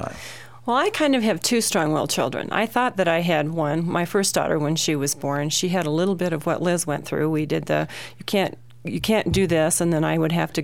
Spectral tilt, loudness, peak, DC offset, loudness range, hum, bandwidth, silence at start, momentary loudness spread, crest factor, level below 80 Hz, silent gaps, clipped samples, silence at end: -4.5 dB/octave; -22 LUFS; -6 dBFS; 0.5%; 2 LU; none; 17 kHz; 0 s; 6 LU; 16 dB; -50 dBFS; none; under 0.1%; 0 s